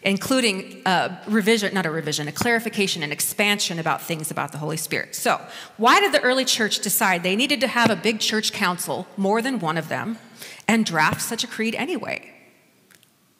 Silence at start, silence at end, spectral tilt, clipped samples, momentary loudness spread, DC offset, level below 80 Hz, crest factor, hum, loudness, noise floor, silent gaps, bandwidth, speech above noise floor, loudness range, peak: 0 s; 1.1 s; -3 dB/octave; under 0.1%; 9 LU; under 0.1%; -66 dBFS; 20 dB; none; -21 LUFS; -56 dBFS; none; 16 kHz; 34 dB; 4 LU; -4 dBFS